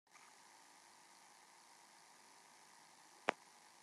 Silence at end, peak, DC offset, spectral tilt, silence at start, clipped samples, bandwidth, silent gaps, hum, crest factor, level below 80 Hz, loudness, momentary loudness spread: 0 s; -14 dBFS; under 0.1%; -1.5 dB/octave; 0.05 s; under 0.1%; 13 kHz; none; none; 40 dB; under -90 dBFS; -49 LUFS; 19 LU